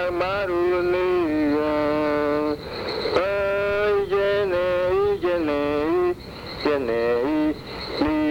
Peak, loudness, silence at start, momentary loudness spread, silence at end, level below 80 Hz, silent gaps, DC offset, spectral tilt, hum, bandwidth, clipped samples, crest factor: -8 dBFS; -23 LUFS; 0 s; 6 LU; 0 s; -46 dBFS; none; under 0.1%; -6.5 dB/octave; none; 17 kHz; under 0.1%; 14 dB